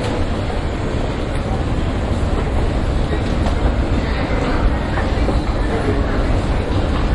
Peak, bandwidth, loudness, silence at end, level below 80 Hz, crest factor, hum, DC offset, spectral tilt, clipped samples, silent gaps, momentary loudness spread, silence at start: -4 dBFS; 11 kHz; -20 LUFS; 0 s; -20 dBFS; 14 dB; none; under 0.1%; -7 dB/octave; under 0.1%; none; 3 LU; 0 s